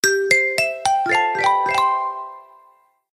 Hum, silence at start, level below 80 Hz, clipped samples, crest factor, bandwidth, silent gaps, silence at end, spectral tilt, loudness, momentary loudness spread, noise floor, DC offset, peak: none; 0.05 s; -66 dBFS; under 0.1%; 18 dB; 16 kHz; none; 0.7 s; -1.5 dB/octave; -18 LUFS; 11 LU; -56 dBFS; under 0.1%; -2 dBFS